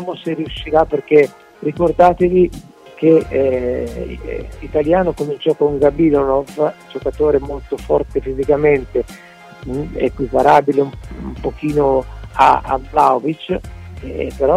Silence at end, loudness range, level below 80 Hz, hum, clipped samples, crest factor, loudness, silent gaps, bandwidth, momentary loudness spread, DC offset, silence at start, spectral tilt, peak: 0 s; 3 LU; -34 dBFS; none; under 0.1%; 16 dB; -16 LUFS; none; 12.5 kHz; 14 LU; under 0.1%; 0 s; -7.5 dB/octave; 0 dBFS